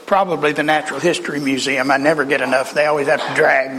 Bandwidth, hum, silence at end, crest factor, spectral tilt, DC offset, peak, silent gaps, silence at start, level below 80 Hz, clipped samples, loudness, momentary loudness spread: 14.5 kHz; none; 0 s; 14 dB; -4 dB/octave; under 0.1%; -2 dBFS; none; 0 s; -58 dBFS; under 0.1%; -16 LUFS; 4 LU